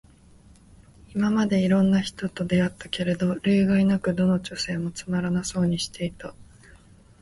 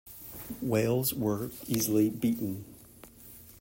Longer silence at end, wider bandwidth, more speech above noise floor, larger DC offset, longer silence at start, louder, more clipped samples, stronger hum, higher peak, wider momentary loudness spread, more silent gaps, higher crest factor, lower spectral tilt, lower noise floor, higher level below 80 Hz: first, 0.8 s vs 0 s; second, 11.5 kHz vs 16.5 kHz; first, 29 dB vs 23 dB; neither; first, 1.1 s vs 0.05 s; first, -24 LUFS vs -30 LUFS; neither; neither; first, -10 dBFS vs -14 dBFS; second, 10 LU vs 22 LU; neither; about the same, 14 dB vs 18 dB; about the same, -6 dB/octave vs -5.5 dB/octave; about the same, -52 dBFS vs -53 dBFS; first, -52 dBFS vs -60 dBFS